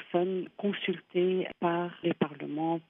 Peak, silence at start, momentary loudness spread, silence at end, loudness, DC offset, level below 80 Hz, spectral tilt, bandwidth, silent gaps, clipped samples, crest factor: -12 dBFS; 0 s; 4 LU; 0.1 s; -31 LUFS; under 0.1%; -80 dBFS; -9.5 dB/octave; 3.8 kHz; none; under 0.1%; 18 dB